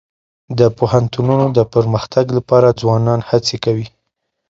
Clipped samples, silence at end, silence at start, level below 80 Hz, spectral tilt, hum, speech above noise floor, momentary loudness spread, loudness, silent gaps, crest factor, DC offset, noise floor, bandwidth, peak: under 0.1%; 0.6 s; 0.5 s; -46 dBFS; -7 dB/octave; none; 59 dB; 7 LU; -15 LUFS; none; 14 dB; under 0.1%; -73 dBFS; 7.8 kHz; 0 dBFS